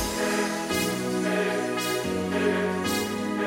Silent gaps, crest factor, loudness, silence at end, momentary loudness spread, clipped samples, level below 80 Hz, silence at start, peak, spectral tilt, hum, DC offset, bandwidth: none; 14 dB; -26 LUFS; 0 s; 2 LU; under 0.1%; -52 dBFS; 0 s; -12 dBFS; -4 dB/octave; none; under 0.1%; 17 kHz